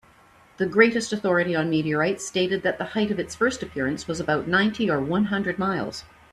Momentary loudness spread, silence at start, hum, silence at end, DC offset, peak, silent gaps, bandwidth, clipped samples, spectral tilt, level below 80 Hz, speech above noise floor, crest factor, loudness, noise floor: 8 LU; 0.6 s; none; 0.3 s; under 0.1%; -2 dBFS; none; 12.5 kHz; under 0.1%; -5 dB/octave; -56 dBFS; 31 dB; 22 dB; -24 LUFS; -54 dBFS